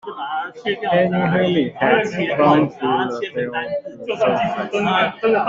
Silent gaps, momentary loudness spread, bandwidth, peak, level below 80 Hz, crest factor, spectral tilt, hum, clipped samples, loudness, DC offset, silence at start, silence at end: none; 10 LU; 7.6 kHz; -2 dBFS; -58 dBFS; 16 dB; -6.5 dB/octave; none; under 0.1%; -19 LUFS; under 0.1%; 0.05 s; 0 s